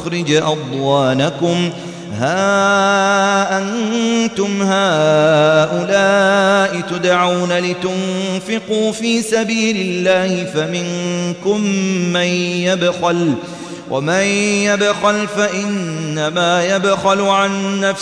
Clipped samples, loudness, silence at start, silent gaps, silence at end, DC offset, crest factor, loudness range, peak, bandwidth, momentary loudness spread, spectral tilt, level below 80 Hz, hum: under 0.1%; -15 LUFS; 0 s; none; 0 s; under 0.1%; 14 dB; 4 LU; 0 dBFS; 11 kHz; 7 LU; -4.5 dB/octave; -58 dBFS; none